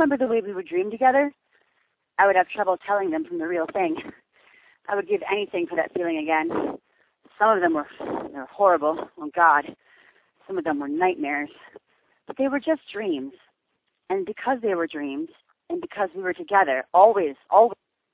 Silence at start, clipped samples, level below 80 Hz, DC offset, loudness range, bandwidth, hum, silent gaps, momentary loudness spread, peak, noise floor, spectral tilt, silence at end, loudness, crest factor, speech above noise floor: 0 s; under 0.1%; -68 dBFS; under 0.1%; 6 LU; 4 kHz; none; none; 14 LU; -2 dBFS; -76 dBFS; -8.5 dB/octave; 0.4 s; -23 LUFS; 22 dB; 53 dB